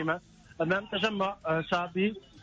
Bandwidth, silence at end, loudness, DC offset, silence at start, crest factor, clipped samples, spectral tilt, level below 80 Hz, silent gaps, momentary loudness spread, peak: 7.8 kHz; 0 s; -30 LUFS; under 0.1%; 0 s; 16 dB; under 0.1%; -6 dB/octave; -62 dBFS; none; 5 LU; -16 dBFS